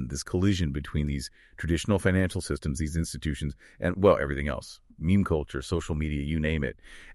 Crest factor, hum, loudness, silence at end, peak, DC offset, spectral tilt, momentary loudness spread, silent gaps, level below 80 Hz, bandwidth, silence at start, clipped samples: 20 dB; none; -28 LUFS; 0 s; -6 dBFS; under 0.1%; -6 dB/octave; 11 LU; none; -38 dBFS; 12.5 kHz; 0 s; under 0.1%